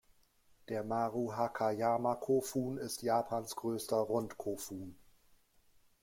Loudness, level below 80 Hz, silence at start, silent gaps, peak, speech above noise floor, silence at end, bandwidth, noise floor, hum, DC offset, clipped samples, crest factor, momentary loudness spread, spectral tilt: -36 LUFS; -72 dBFS; 0.7 s; none; -20 dBFS; 33 dB; 1 s; 16.5 kHz; -68 dBFS; none; under 0.1%; under 0.1%; 18 dB; 9 LU; -5.5 dB/octave